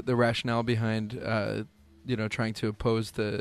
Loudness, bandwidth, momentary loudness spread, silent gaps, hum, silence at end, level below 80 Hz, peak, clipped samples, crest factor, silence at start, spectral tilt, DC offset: -30 LUFS; 13 kHz; 9 LU; none; none; 0 s; -54 dBFS; -12 dBFS; under 0.1%; 16 dB; 0 s; -6.5 dB/octave; under 0.1%